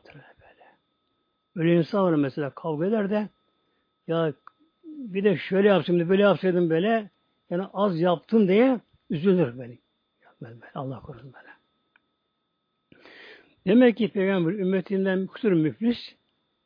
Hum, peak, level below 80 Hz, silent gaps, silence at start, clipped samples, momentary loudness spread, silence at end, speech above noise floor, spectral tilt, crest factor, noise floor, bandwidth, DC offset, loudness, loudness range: none; -6 dBFS; -70 dBFS; none; 0.15 s; under 0.1%; 20 LU; 0.55 s; 54 dB; -10 dB/octave; 18 dB; -77 dBFS; 5.2 kHz; under 0.1%; -24 LUFS; 11 LU